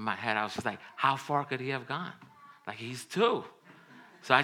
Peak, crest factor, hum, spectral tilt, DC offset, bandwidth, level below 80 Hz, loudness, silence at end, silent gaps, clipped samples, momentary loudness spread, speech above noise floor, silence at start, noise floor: -6 dBFS; 26 dB; none; -4.5 dB/octave; under 0.1%; 17.5 kHz; -82 dBFS; -32 LUFS; 0 s; none; under 0.1%; 16 LU; 23 dB; 0 s; -55 dBFS